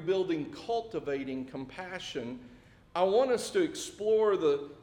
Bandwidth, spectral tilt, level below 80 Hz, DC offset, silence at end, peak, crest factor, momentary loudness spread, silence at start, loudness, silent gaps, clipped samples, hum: 16 kHz; -4.5 dB/octave; -64 dBFS; under 0.1%; 0 s; -16 dBFS; 16 dB; 13 LU; 0 s; -31 LUFS; none; under 0.1%; none